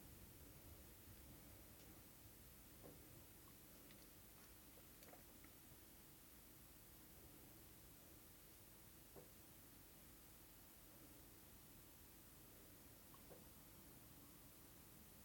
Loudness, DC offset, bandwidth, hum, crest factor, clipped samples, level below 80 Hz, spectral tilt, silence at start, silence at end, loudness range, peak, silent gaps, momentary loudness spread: -62 LUFS; under 0.1%; 17.5 kHz; none; 20 dB; under 0.1%; -72 dBFS; -3.5 dB/octave; 0 s; 0 s; 1 LU; -44 dBFS; none; 1 LU